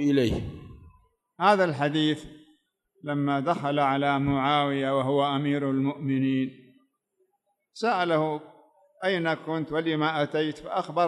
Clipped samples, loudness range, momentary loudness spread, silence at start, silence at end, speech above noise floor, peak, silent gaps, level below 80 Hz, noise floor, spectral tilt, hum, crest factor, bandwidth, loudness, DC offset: under 0.1%; 4 LU; 8 LU; 0 s; 0 s; 50 dB; -8 dBFS; none; -54 dBFS; -75 dBFS; -6.5 dB/octave; none; 18 dB; 11.5 kHz; -26 LUFS; under 0.1%